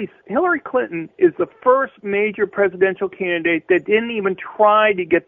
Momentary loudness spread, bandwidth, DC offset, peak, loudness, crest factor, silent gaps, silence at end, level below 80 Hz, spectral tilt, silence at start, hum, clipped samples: 7 LU; 3.8 kHz; under 0.1%; -2 dBFS; -18 LUFS; 16 dB; none; 0.05 s; -62 dBFS; -9 dB/octave; 0 s; none; under 0.1%